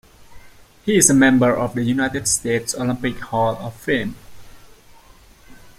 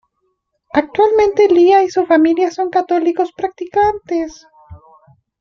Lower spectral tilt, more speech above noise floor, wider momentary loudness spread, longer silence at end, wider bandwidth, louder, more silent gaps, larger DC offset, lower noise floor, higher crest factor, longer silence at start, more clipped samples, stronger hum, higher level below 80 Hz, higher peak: second, -4 dB/octave vs -5.5 dB/octave; second, 29 dB vs 54 dB; about the same, 11 LU vs 10 LU; second, 0.1 s vs 0.65 s; first, 16 kHz vs 7 kHz; second, -18 LUFS vs -14 LUFS; neither; neither; second, -47 dBFS vs -68 dBFS; first, 20 dB vs 14 dB; second, 0.2 s vs 0.75 s; neither; neither; about the same, -48 dBFS vs -50 dBFS; about the same, 0 dBFS vs 0 dBFS